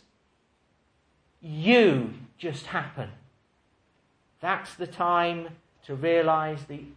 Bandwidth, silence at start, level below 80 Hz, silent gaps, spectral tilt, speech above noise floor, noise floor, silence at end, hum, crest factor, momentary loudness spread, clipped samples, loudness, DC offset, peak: 10.5 kHz; 1.45 s; -66 dBFS; none; -6.5 dB/octave; 43 dB; -69 dBFS; 0.05 s; none; 20 dB; 20 LU; under 0.1%; -26 LUFS; under 0.1%; -8 dBFS